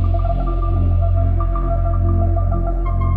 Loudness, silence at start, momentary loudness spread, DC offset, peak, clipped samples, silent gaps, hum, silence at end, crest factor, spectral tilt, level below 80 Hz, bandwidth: -19 LUFS; 0 s; 3 LU; under 0.1%; -6 dBFS; under 0.1%; none; none; 0 s; 10 dB; -11.5 dB/octave; -18 dBFS; 2.9 kHz